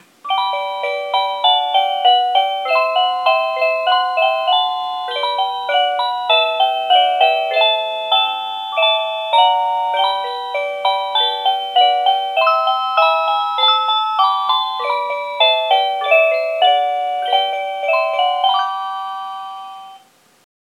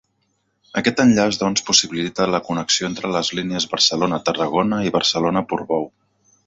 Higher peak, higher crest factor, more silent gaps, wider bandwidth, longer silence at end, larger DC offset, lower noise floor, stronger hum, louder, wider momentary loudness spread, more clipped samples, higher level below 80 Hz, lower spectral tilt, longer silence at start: about the same, 0 dBFS vs 0 dBFS; about the same, 16 dB vs 20 dB; neither; first, 13.5 kHz vs 8 kHz; first, 0.8 s vs 0.6 s; neither; second, -48 dBFS vs -68 dBFS; neither; first, -16 LUFS vs -19 LUFS; about the same, 8 LU vs 7 LU; neither; second, -88 dBFS vs -56 dBFS; second, 0.5 dB/octave vs -3.5 dB/octave; second, 0.25 s vs 0.75 s